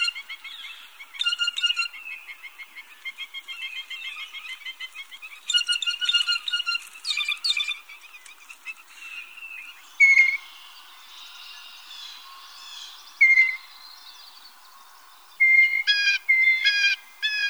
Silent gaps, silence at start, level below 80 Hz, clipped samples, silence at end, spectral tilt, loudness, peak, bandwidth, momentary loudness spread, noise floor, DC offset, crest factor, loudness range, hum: none; 0 s; -82 dBFS; under 0.1%; 0 s; 5.5 dB/octave; -20 LUFS; -8 dBFS; over 20 kHz; 25 LU; -50 dBFS; 0.1%; 20 dB; 9 LU; none